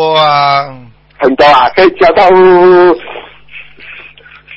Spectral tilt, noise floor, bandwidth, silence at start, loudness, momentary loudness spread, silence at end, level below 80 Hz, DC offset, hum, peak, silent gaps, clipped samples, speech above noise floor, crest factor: -6.5 dB/octave; -35 dBFS; 8 kHz; 0 s; -6 LUFS; 22 LU; 0 s; -42 dBFS; under 0.1%; 50 Hz at -50 dBFS; 0 dBFS; none; 0.5%; 30 dB; 8 dB